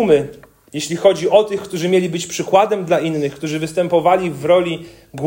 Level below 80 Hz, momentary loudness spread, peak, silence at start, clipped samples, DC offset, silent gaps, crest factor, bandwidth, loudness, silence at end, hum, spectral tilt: -54 dBFS; 10 LU; 0 dBFS; 0 s; under 0.1%; under 0.1%; none; 16 dB; 16.5 kHz; -17 LUFS; 0 s; none; -5 dB/octave